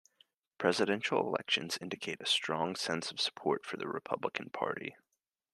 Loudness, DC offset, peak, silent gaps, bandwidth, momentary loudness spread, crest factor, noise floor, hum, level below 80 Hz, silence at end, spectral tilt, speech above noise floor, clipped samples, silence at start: -34 LUFS; under 0.1%; -12 dBFS; none; 13 kHz; 8 LU; 24 dB; -86 dBFS; none; -82 dBFS; 0.6 s; -3 dB/octave; 51 dB; under 0.1%; 0.6 s